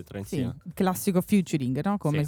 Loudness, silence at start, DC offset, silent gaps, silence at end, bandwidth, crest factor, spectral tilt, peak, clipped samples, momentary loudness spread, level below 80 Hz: -27 LUFS; 0 s; under 0.1%; none; 0 s; over 20 kHz; 14 dB; -6.5 dB/octave; -12 dBFS; under 0.1%; 8 LU; -56 dBFS